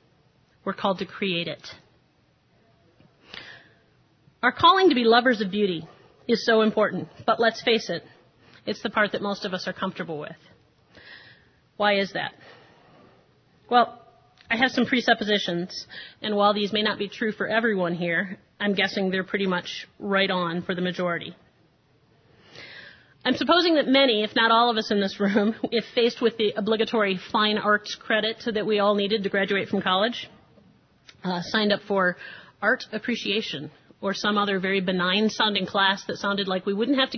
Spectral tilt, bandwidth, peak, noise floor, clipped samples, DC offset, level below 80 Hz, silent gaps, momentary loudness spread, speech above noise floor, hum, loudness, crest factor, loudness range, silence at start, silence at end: -5 dB/octave; 6.6 kHz; -4 dBFS; -63 dBFS; under 0.1%; under 0.1%; -66 dBFS; none; 15 LU; 40 dB; none; -24 LUFS; 20 dB; 9 LU; 0.65 s; 0 s